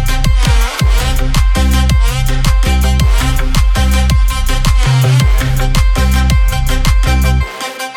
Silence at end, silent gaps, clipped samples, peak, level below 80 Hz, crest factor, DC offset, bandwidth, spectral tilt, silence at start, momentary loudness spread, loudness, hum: 0 s; none; under 0.1%; 0 dBFS; -12 dBFS; 10 dB; under 0.1%; 17.5 kHz; -5 dB/octave; 0 s; 3 LU; -13 LUFS; none